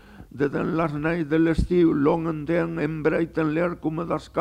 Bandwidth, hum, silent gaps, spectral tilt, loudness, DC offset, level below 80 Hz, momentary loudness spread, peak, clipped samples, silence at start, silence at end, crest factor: 9.4 kHz; none; none; -8.5 dB/octave; -24 LUFS; under 0.1%; -40 dBFS; 7 LU; -8 dBFS; under 0.1%; 0.1 s; 0 s; 14 dB